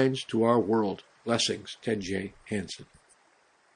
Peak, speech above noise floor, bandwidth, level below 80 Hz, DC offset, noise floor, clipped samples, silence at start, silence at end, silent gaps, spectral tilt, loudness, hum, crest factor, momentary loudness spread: -10 dBFS; 36 dB; 10.5 kHz; -66 dBFS; under 0.1%; -65 dBFS; under 0.1%; 0 s; 0.9 s; none; -4.5 dB/octave; -29 LUFS; none; 20 dB; 11 LU